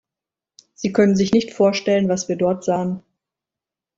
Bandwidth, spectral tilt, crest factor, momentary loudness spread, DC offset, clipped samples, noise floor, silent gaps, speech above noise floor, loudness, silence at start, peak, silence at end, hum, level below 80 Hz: 7.8 kHz; -6 dB/octave; 18 dB; 9 LU; under 0.1%; under 0.1%; -88 dBFS; none; 70 dB; -19 LUFS; 0.8 s; -4 dBFS; 1 s; none; -58 dBFS